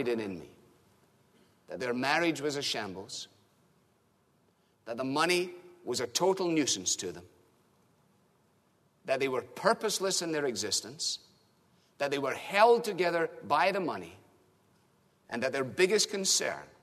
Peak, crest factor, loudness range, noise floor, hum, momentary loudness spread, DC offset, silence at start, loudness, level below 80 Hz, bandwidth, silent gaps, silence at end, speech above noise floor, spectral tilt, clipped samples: -10 dBFS; 24 dB; 5 LU; -70 dBFS; none; 15 LU; under 0.1%; 0 s; -30 LUFS; -78 dBFS; 13.5 kHz; none; 0.15 s; 39 dB; -2.5 dB/octave; under 0.1%